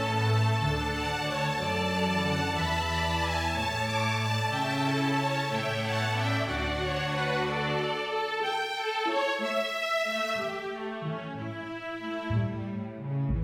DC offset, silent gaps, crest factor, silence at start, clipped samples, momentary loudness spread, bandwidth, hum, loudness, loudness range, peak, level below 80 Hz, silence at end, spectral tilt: under 0.1%; none; 14 dB; 0 s; under 0.1%; 8 LU; 19 kHz; none; -29 LUFS; 3 LU; -16 dBFS; -46 dBFS; 0 s; -5 dB/octave